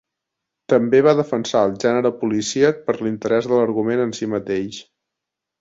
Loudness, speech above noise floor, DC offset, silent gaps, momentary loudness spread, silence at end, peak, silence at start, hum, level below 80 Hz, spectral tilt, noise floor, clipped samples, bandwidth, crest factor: -19 LUFS; 65 dB; under 0.1%; none; 9 LU; 0.8 s; -2 dBFS; 0.7 s; none; -60 dBFS; -5.5 dB/octave; -83 dBFS; under 0.1%; 7.8 kHz; 18 dB